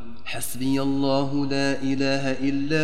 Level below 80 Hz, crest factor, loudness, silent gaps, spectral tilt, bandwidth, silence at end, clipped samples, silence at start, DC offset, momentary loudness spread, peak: -56 dBFS; 14 dB; -25 LUFS; none; -5 dB/octave; 16 kHz; 0 s; under 0.1%; 0 s; 4%; 6 LU; -10 dBFS